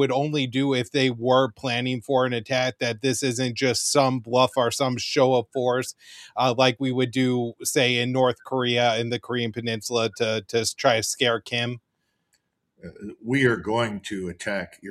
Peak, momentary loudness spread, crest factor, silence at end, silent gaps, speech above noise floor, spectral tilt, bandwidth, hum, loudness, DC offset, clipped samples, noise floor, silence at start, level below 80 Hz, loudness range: -4 dBFS; 9 LU; 20 dB; 0 s; none; 50 dB; -4 dB/octave; 14.5 kHz; none; -23 LUFS; under 0.1%; under 0.1%; -73 dBFS; 0 s; -64 dBFS; 4 LU